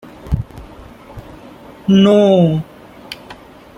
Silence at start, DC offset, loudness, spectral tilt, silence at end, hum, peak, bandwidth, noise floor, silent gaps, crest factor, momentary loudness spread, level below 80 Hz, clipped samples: 0.25 s; under 0.1%; -13 LUFS; -8 dB/octave; 0.45 s; none; -2 dBFS; 10.5 kHz; -38 dBFS; none; 14 dB; 26 LU; -36 dBFS; under 0.1%